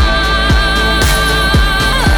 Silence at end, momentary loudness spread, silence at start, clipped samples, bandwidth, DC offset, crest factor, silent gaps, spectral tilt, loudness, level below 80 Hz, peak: 0 s; 1 LU; 0 s; under 0.1%; over 20 kHz; under 0.1%; 8 dB; none; -4 dB/octave; -11 LUFS; -14 dBFS; -2 dBFS